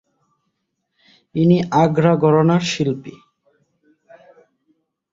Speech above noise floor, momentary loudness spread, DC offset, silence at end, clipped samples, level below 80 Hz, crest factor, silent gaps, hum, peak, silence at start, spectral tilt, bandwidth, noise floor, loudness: 58 dB; 14 LU; under 0.1%; 2 s; under 0.1%; -58 dBFS; 18 dB; none; none; -2 dBFS; 1.35 s; -7 dB/octave; 7.8 kHz; -74 dBFS; -17 LUFS